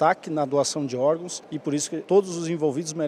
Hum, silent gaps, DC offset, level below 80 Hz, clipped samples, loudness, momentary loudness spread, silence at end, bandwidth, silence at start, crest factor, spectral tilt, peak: none; none; under 0.1%; -74 dBFS; under 0.1%; -25 LUFS; 7 LU; 0 s; 13.5 kHz; 0 s; 18 dB; -4.5 dB/octave; -6 dBFS